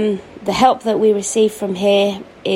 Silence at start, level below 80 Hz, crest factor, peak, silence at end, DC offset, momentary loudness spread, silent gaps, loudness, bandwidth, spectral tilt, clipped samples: 0 s; -52 dBFS; 16 dB; 0 dBFS; 0 s; under 0.1%; 8 LU; none; -16 LUFS; 16 kHz; -4.5 dB/octave; under 0.1%